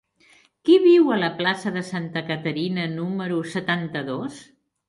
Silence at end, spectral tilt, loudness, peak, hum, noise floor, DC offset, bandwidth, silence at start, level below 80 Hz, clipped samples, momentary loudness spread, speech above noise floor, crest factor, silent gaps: 0.45 s; -6.5 dB/octave; -22 LUFS; -6 dBFS; none; -57 dBFS; under 0.1%; 11.5 kHz; 0.65 s; -68 dBFS; under 0.1%; 13 LU; 36 dB; 18 dB; none